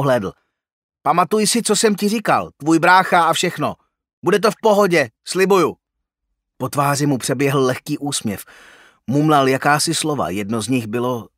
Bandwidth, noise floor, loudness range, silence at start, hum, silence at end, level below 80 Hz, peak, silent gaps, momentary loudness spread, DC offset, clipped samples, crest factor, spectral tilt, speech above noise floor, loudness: 16 kHz; -78 dBFS; 4 LU; 0 s; none; 0.1 s; -60 dBFS; 0 dBFS; 0.72-0.89 s, 4.13-4.22 s; 10 LU; under 0.1%; under 0.1%; 18 dB; -4.5 dB/octave; 61 dB; -17 LUFS